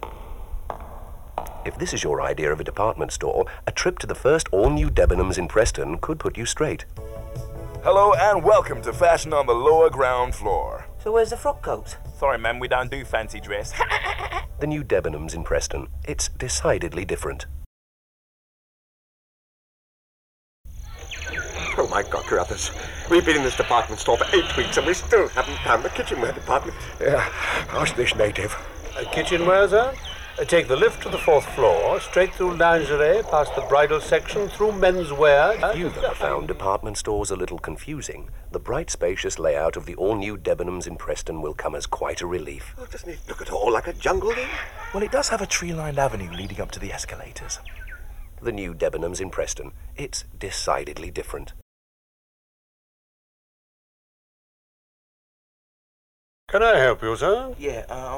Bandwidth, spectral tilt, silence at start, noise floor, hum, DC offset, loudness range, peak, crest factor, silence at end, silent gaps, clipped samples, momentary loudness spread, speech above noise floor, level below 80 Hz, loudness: 17 kHz; -4 dB/octave; 0 s; under -90 dBFS; none; under 0.1%; 10 LU; -6 dBFS; 16 dB; 0 s; 17.66-20.64 s, 51.62-56.47 s; under 0.1%; 16 LU; over 68 dB; -36 dBFS; -23 LUFS